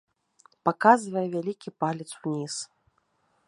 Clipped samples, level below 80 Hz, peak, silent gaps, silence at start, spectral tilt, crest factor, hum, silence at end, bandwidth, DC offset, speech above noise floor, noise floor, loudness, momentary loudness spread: under 0.1%; -76 dBFS; -4 dBFS; none; 0.65 s; -5 dB/octave; 24 dB; none; 0.8 s; 11.5 kHz; under 0.1%; 45 dB; -71 dBFS; -27 LUFS; 14 LU